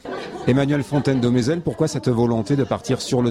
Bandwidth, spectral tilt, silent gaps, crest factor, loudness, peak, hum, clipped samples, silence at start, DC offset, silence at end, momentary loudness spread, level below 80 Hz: 13.5 kHz; -6.5 dB/octave; none; 14 dB; -20 LUFS; -6 dBFS; none; under 0.1%; 0.05 s; under 0.1%; 0 s; 4 LU; -48 dBFS